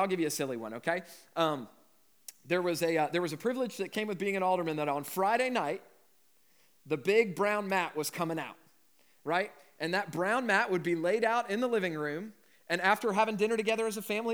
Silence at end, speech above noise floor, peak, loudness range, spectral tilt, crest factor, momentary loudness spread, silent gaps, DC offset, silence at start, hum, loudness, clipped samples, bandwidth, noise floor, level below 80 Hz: 0 s; 38 dB; -12 dBFS; 3 LU; -4.5 dB/octave; 20 dB; 11 LU; none; under 0.1%; 0 s; none; -31 LUFS; under 0.1%; over 20 kHz; -69 dBFS; under -90 dBFS